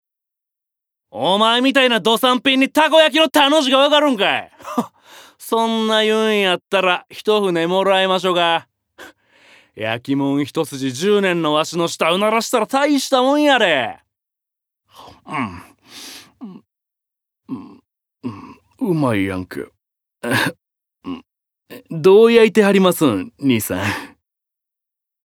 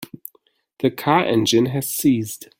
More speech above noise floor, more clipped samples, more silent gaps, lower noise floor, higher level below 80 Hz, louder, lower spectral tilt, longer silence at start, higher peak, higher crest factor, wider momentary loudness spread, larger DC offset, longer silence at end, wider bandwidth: first, 68 dB vs 43 dB; neither; neither; first, -84 dBFS vs -62 dBFS; second, -64 dBFS vs -58 dBFS; first, -16 LUFS vs -19 LUFS; about the same, -4 dB/octave vs -4.5 dB/octave; first, 1.15 s vs 0 s; about the same, 0 dBFS vs -2 dBFS; about the same, 18 dB vs 18 dB; about the same, 20 LU vs 20 LU; neither; first, 1.2 s vs 0.15 s; about the same, 18.5 kHz vs 17 kHz